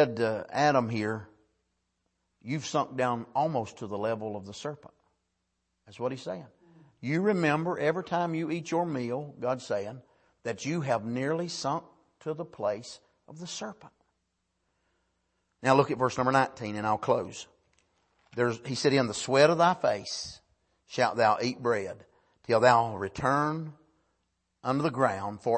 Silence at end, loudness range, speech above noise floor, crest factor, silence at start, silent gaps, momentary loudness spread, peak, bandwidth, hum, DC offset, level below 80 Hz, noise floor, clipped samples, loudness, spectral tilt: 0 s; 9 LU; 51 dB; 24 dB; 0 s; none; 16 LU; -8 dBFS; 8.8 kHz; none; under 0.1%; -68 dBFS; -80 dBFS; under 0.1%; -29 LUFS; -5.5 dB/octave